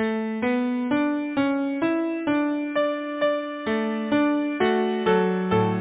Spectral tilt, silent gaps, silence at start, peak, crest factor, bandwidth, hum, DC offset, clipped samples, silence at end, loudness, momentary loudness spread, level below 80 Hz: -10.5 dB/octave; none; 0 s; -10 dBFS; 14 dB; 4 kHz; none; under 0.1%; under 0.1%; 0 s; -24 LUFS; 4 LU; -60 dBFS